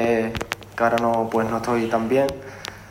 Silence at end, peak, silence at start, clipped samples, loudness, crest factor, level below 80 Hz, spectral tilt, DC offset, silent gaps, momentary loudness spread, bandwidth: 0 s; -4 dBFS; 0 s; under 0.1%; -22 LUFS; 18 dB; -48 dBFS; -5.5 dB/octave; under 0.1%; none; 12 LU; 16 kHz